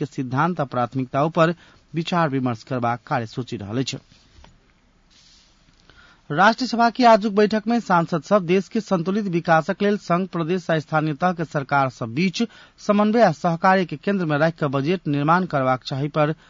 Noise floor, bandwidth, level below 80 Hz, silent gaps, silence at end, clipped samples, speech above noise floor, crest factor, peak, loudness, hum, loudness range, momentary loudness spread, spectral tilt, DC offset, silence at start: -58 dBFS; 7.6 kHz; -60 dBFS; none; 0.15 s; under 0.1%; 37 dB; 16 dB; -4 dBFS; -21 LUFS; none; 7 LU; 9 LU; -6.5 dB/octave; under 0.1%; 0 s